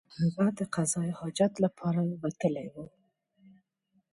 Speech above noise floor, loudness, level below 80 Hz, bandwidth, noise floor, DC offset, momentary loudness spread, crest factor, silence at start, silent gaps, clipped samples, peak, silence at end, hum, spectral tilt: 44 dB; -30 LUFS; -68 dBFS; 11.5 kHz; -74 dBFS; under 0.1%; 12 LU; 18 dB; 0.1 s; none; under 0.1%; -14 dBFS; 1.3 s; none; -6 dB/octave